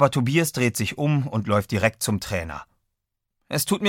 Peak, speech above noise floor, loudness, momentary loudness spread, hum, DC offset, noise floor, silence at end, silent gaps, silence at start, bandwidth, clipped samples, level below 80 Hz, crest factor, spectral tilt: -4 dBFS; 57 dB; -23 LUFS; 8 LU; none; under 0.1%; -80 dBFS; 0 s; none; 0 s; 17 kHz; under 0.1%; -50 dBFS; 20 dB; -5 dB/octave